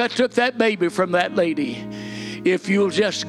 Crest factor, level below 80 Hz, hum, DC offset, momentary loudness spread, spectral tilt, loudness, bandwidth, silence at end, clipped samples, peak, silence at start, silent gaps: 16 dB; -62 dBFS; none; under 0.1%; 12 LU; -5 dB/octave; -20 LUFS; 12.5 kHz; 0 s; under 0.1%; -6 dBFS; 0 s; none